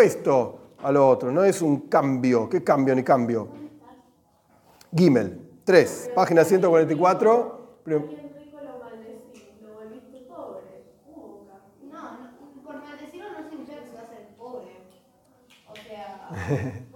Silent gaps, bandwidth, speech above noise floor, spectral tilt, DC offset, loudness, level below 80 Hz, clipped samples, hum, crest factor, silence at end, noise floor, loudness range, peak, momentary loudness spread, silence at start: none; 17.5 kHz; 41 dB; -6.5 dB/octave; under 0.1%; -21 LUFS; -70 dBFS; under 0.1%; none; 22 dB; 0.1 s; -61 dBFS; 23 LU; -2 dBFS; 25 LU; 0 s